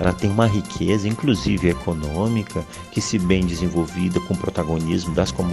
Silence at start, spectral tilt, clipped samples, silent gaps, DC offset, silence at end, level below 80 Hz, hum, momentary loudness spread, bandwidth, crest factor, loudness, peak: 0 s; -6 dB/octave; under 0.1%; none; under 0.1%; 0 s; -36 dBFS; none; 6 LU; 12.5 kHz; 18 dB; -22 LUFS; -2 dBFS